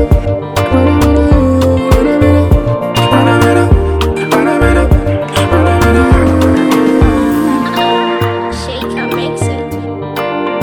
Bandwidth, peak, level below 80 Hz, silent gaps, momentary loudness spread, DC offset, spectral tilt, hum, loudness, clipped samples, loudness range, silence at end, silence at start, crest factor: 19 kHz; 0 dBFS; -18 dBFS; none; 8 LU; under 0.1%; -6.5 dB/octave; none; -11 LUFS; under 0.1%; 4 LU; 0 s; 0 s; 10 dB